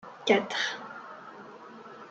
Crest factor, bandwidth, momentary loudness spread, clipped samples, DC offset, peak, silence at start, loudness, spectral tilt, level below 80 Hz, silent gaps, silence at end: 24 dB; 8.2 kHz; 21 LU; under 0.1%; under 0.1%; -10 dBFS; 0.05 s; -28 LUFS; -3.5 dB/octave; -84 dBFS; none; 0 s